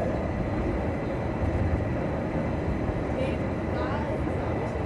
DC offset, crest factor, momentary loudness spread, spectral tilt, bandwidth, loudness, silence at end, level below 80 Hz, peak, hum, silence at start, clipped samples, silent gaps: under 0.1%; 14 dB; 2 LU; -8.5 dB/octave; 10.5 kHz; -29 LUFS; 0 s; -36 dBFS; -14 dBFS; none; 0 s; under 0.1%; none